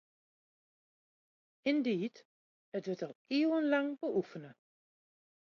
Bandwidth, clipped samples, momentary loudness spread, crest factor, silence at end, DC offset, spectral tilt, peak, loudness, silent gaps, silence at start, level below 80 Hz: 6.8 kHz; under 0.1%; 12 LU; 20 dB; 0.9 s; under 0.1%; -6.5 dB/octave; -18 dBFS; -35 LUFS; 2.25-2.72 s, 3.15-3.25 s; 1.65 s; -86 dBFS